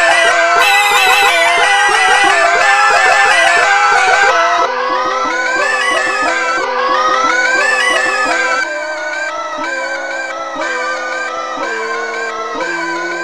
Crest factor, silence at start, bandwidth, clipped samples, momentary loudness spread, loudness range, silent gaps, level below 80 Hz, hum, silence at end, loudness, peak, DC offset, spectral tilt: 12 dB; 0 s; 16 kHz; under 0.1%; 11 LU; 10 LU; none; -50 dBFS; none; 0 s; -11 LUFS; 0 dBFS; under 0.1%; 0 dB/octave